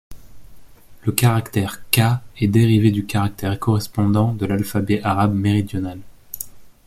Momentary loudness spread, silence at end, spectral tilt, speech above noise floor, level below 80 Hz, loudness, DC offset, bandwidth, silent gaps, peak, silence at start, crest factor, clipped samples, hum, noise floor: 14 LU; 0.15 s; -6 dB/octave; 23 dB; -46 dBFS; -19 LUFS; under 0.1%; 16 kHz; none; 0 dBFS; 0.1 s; 20 dB; under 0.1%; none; -41 dBFS